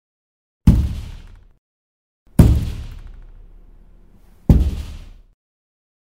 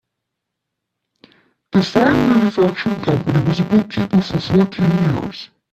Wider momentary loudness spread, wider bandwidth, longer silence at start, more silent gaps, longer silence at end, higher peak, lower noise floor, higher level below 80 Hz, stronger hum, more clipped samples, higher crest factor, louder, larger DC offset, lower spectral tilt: first, 23 LU vs 6 LU; first, 16 kHz vs 13 kHz; second, 0.65 s vs 1.75 s; first, 1.58-2.26 s vs none; first, 1.2 s vs 0.25 s; about the same, 0 dBFS vs 0 dBFS; second, -48 dBFS vs -78 dBFS; first, -24 dBFS vs -46 dBFS; neither; neither; about the same, 20 dB vs 16 dB; about the same, -18 LUFS vs -16 LUFS; first, 0.2% vs under 0.1%; about the same, -8.5 dB/octave vs -7.5 dB/octave